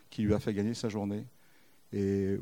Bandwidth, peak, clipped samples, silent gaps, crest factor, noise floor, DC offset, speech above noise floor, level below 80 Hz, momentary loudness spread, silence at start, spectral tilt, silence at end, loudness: 16.5 kHz; -16 dBFS; under 0.1%; none; 18 dB; -65 dBFS; under 0.1%; 34 dB; -58 dBFS; 10 LU; 0.1 s; -7 dB/octave; 0 s; -33 LUFS